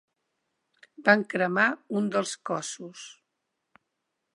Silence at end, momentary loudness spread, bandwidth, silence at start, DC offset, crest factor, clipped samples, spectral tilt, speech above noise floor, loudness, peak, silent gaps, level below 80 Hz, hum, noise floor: 1.2 s; 19 LU; 11.5 kHz; 1 s; under 0.1%; 26 dB; under 0.1%; -4 dB/octave; 55 dB; -26 LUFS; -4 dBFS; none; -82 dBFS; none; -82 dBFS